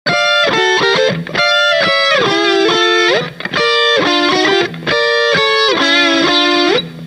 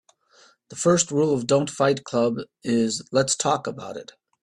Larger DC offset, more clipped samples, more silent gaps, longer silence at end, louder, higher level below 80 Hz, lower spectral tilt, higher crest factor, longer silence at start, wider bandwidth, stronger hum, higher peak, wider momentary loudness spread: neither; neither; neither; second, 0 s vs 0.4 s; first, -11 LUFS vs -23 LUFS; first, -52 dBFS vs -64 dBFS; second, -3 dB/octave vs -4.5 dB/octave; second, 12 dB vs 18 dB; second, 0.05 s vs 0.7 s; about the same, 12.5 kHz vs 12.5 kHz; neither; first, 0 dBFS vs -6 dBFS; second, 4 LU vs 14 LU